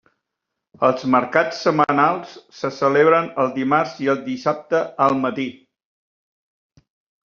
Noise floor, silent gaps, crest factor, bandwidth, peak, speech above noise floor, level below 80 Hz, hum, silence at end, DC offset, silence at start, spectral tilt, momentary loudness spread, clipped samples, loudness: -81 dBFS; none; 20 dB; 7.2 kHz; 0 dBFS; 62 dB; -66 dBFS; none; 1.75 s; under 0.1%; 0.8 s; -4 dB/octave; 12 LU; under 0.1%; -19 LUFS